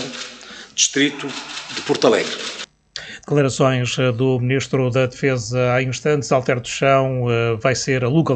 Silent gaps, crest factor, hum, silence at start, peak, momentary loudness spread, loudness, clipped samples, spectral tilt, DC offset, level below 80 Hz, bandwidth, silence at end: none; 18 dB; none; 0 s; -2 dBFS; 13 LU; -19 LUFS; under 0.1%; -4.5 dB/octave; under 0.1%; -52 dBFS; 9 kHz; 0 s